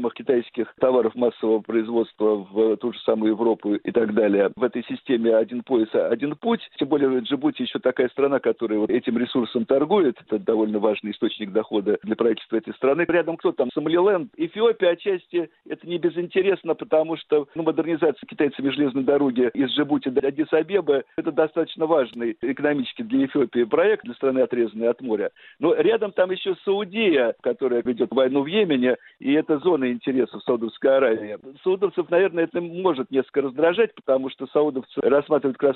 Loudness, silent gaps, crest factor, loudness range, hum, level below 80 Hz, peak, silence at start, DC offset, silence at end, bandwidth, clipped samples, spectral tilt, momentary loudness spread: -22 LUFS; none; 16 dB; 1 LU; none; -66 dBFS; -4 dBFS; 0 s; under 0.1%; 0 s; 4.3 kHz; under 0.1%; -4 dB/octave; 6 LU